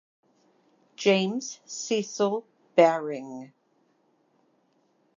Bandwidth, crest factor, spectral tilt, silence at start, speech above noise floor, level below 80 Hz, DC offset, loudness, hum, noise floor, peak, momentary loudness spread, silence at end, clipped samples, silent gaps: 7.6 kHz; 24 dB; -4 dB/octave; 1 s; 43 dB; -88 dBFS; under 0.1%; -26 LUFS; none; -68 dBFS; -6 dBFS; 15 LU; 1.7 s; under 0.1%; none